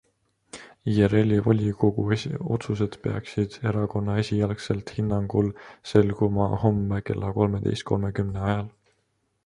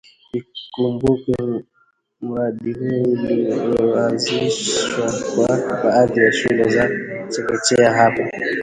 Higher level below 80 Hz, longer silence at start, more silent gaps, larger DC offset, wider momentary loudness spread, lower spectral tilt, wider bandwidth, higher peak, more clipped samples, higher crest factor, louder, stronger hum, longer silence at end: about the same, -46 dBFS vs -50 dBFS; first, 0.55 s vs 0.35 s; neither; neither; second, 8 LU vs 12 LU; first, -8 dB/octave vs -4.5 dB/octave; about the same, 10.5 kHz vs 11 kHz; second, -4 dBFS vs 0 dBFS; neither; about the same, 20 dB vs 18 dB; second, -25 LUFS vs -18 LUFS; neither; first, 0.75 s vs 0 s